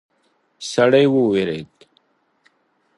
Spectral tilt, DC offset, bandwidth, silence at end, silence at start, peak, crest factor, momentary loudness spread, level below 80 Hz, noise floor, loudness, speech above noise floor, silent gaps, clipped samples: -5.5 dB/octave; under 0.1%; 11.5 kHz; 1.35 s; 0.6 s; -2 dBFS; 18 dB; 16 LU; -62 dBFS; -64 dBFS; -17 LUFS; 48 dB; none; under 0.1%